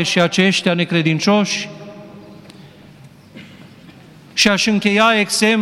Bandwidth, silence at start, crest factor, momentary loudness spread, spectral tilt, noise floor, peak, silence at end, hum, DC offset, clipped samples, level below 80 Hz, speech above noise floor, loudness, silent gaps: 15 kHz; 0 s; 16 dB; 11 LU; -4 dB/octave; -42 dBFS; -2 dBFS; 0 s; none; under 0.1%; under 0.1%; -58 dBFS; 27 dB; -15 LUFS; none